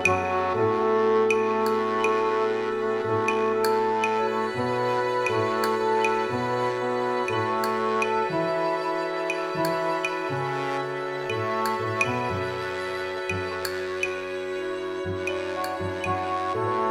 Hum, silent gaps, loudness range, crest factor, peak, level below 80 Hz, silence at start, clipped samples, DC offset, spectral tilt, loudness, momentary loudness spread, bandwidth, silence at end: none; none; 5 LU; 18 dB; -8 dBFS; -64 dBFS; 0 s; under 0.1%; under 0.1%; -5 dB/octave; -26 LUFS; 6 LU; 16 kHz; 0 s